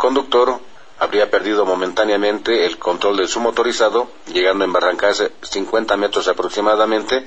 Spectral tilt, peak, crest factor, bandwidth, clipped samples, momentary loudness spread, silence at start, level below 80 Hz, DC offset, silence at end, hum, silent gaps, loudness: -2.5 dB/octave; -2 dBFS; 16 dB; 8.6 kHz; under 0.1%; 5 LU; 0 s; -50 dBFS; 1%; 0 s; none; none; -17 LUFS